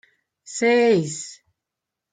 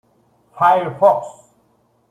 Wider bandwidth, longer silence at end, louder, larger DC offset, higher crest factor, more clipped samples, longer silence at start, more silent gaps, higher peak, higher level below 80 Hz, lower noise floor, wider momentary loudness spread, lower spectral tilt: second, 9.6 kHz vs 14.5 kHz; about the same, 0.8 s vs 0.8 s; second, -19 LUFS vs -16 LUFS; neither; about the same, 16 dB vs 18 dB; neither; about the same, 0.45 s vs 0.55 s; neither; second, -8 dBFS vs -2 dBFS; about the same, -72 dBFS vs -68 dBFS; first, -85 dBFS vs -60 dBFS; first, 17 LU vs 10 LU; second, -4.5 dB/octave vs -6 dB/octave